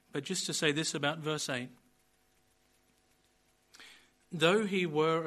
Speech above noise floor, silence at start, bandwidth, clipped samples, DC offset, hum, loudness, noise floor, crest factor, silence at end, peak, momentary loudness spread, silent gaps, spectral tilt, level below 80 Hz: 39 dB; 0.15 s; 13 kHz; under 0.1%; under 0.1%; none; -32 LUFS; -71 dBFS; 22 dB; 0 s; -12 dBFS; 18 LU; none; -3.5 dB/octave; -76 dBFS